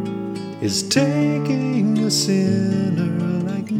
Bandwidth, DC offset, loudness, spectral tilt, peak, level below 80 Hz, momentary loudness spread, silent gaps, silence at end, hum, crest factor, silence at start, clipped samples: 16 kHz; under 0.1%; -20 LUFS; -5 dB/octave; -4 dBFS; -62 dBFS; 8 LU; none; 0 s; none; 16 dB; 0 s; under 0.1%